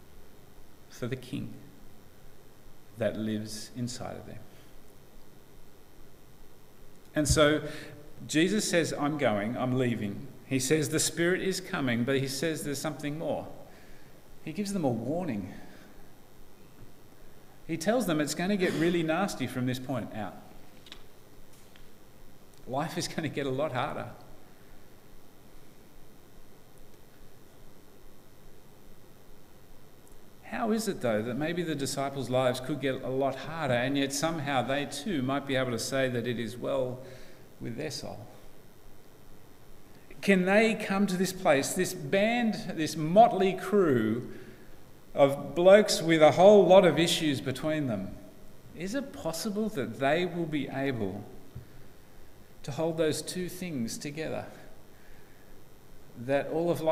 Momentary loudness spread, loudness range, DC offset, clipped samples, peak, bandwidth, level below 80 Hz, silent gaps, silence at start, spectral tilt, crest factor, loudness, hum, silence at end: 18 LU; 14 LU; under 0.1%; under 0.1%; -6 dBFS; 16 kHz; -54 dBFS; none; 0 s; -5 dB/octave; 24 dB; -28 LUFS; none; 0 s